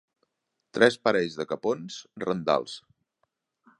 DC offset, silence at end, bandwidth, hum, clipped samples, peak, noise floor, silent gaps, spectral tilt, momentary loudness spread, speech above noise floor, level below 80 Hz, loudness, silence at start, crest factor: under 0.1%; 1 s; 11 kHz; none; under 0.1%; -4 dBFS; -77 dBFS; none; -4.5 dB/octave; 18 LU; 51 dB; -68 dBFS; -26 LUFS; 0.75 s; 24 dB